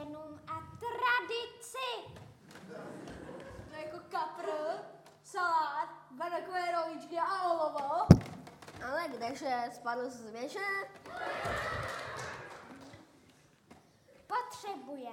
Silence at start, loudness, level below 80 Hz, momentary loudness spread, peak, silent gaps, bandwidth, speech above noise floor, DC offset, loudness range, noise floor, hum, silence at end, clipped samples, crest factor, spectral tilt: 0 s; -35 LUFS; -56 dBFS; 17 LU; -2 dBFS; none; 16 kHz; 26 dB; under 0.1%; 11 LU; -64 dBFS; none; 0 s; under 0.1%; 34 dB; -6 dB/octave